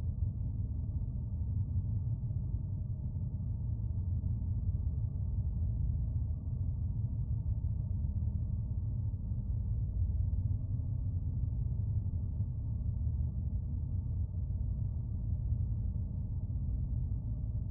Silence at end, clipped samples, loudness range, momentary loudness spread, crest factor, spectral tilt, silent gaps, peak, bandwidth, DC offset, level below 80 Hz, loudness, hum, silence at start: 0 s; under 0.1%; 1 LU; 3 LU; 12 dB; -14.5 dB/octave; none; -22 dBFS; 1.3 kHz; under 0.1%; -40 dBFS; -37 LUFS; none; 0 s